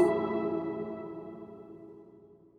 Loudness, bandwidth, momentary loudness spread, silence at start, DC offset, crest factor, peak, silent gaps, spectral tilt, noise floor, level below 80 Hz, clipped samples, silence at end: -34 LUFS; 10.5 kHz; 21 LU; 0 s; under 0.1%; 20 dB; -14 dBFS; none; -8 dB/octave; -56 dBFS; -70 dBFS; under 0.1%; 0.3 s